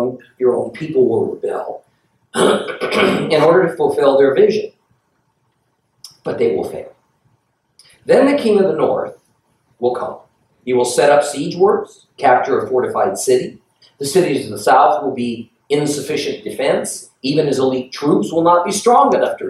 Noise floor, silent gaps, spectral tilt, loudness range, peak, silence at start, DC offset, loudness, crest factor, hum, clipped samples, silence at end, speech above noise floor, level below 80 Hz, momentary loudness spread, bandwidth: -65 dBFS; none; -4.5 dB/octave; 4 LU; 0 dBFS; 0 s; under 0.1%; -16 LUFS; 16 dB; none; under 0.1%; 0 s; 50 dB; -62 dBFS; 13 LU; 14 kHz